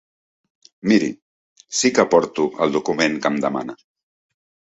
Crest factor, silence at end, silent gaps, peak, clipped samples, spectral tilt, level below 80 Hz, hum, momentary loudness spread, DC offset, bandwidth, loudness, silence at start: 20 dB; 0.95 s; 1.22-1.56 s; -2 dBFS; under 0.1%; -4 dB/octave; -62 dBFS; none; 11 LU; under 0.1%; 8.4 kHz; -19 LUFS; 0.85 s